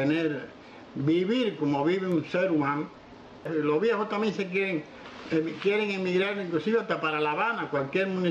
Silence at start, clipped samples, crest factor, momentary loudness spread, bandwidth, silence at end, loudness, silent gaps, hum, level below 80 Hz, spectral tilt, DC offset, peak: 0 s; under 0.1%; 14 dB; 10 LU; 8.8 kHz; 0 s; -28 LUFS; none; none; -68 dBFS; -7 dB/octave; under 0.1%; -14 dBFS